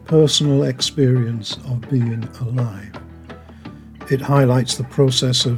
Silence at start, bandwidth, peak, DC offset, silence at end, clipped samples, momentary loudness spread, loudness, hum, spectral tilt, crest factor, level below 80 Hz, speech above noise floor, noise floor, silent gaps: 0.1 s; 14.5 kHz; -2 dBFS; under 0.1%; 0 s; under 0.1%; 23 LU; -18 LUFS; none; -5.5 dB/octave; 16 dB; -48 dBFS; 21 dB; -38 dBFS; none